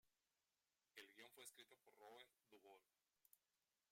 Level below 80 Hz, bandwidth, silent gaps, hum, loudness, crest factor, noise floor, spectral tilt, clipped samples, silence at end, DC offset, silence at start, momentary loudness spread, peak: under -90 dBFS; 16.5 kHz; none; none; -65 LUFS; 26 dB; under -90 dBFS; -0.5 dB/octave; under 0.1%; 0.35 s; under 0.1%; 0.05 s; 6 LU; -44 dBFS